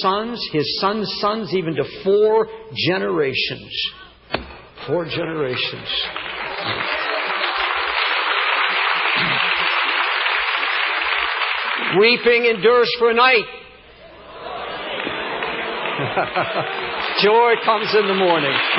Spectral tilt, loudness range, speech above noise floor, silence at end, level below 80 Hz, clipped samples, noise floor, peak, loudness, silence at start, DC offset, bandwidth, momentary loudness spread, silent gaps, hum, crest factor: -8.5 dB/octave; 7 LU; 25 dB; 0 s; -54 dBFS; under 0.1%; -43 dBFS; -4 dBFS; -18 LUFS; 0 s; under 0.1%; 5.8 kHz; 11 LU; none; none; 16 dB